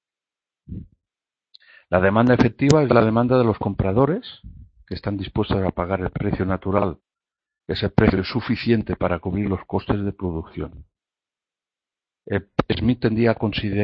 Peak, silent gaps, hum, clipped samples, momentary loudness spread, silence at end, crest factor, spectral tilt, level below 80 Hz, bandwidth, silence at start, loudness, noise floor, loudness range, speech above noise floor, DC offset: 0 dBFS; none; none; under 0.1%; 14 LU; 0 s; 22 dB; -7.5 dB/octave; -40 dBFS; 8.2 kHz; 0.7 s; -21 LUFS; under -90 dBFS; 8 LU; over 70 dB; under 0.1%